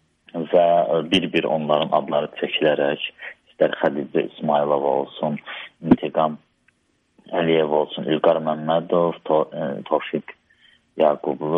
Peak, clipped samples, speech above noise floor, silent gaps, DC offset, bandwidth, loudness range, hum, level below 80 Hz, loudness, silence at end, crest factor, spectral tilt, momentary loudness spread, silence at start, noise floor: -4 dBFS; under 0.1%; 43 dB; none; under 0.1%; 9.6 kHz; 3 LU; none; -58 dBFS; -21 LUFS; 0 s; 18 dB; -7 dB/octave; 11 LU; 0.35 s; -64 dBFS